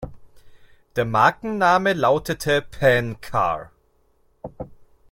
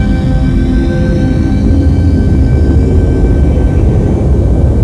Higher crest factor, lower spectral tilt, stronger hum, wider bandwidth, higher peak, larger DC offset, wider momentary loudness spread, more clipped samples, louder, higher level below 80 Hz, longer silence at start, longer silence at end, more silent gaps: first, 20 dB vs 8 dB; second, -5.5 dB/octave vs -9 dB/octave; neither; first, 16.5 kHz vs 10.5 kHz; about the same, -2 dBFS vs 0 dBFS; second, under 0.1% vs 0.4%; first, 22 LU vs 2 LU; second, under 0.1% vs 0.6%; second, -20 LUFS vs -10 LUFS; second, -48 dBFS vs -12 dBFS; about the same, 0 s vs 0 s; first, 0.45 s vs 0 s; neither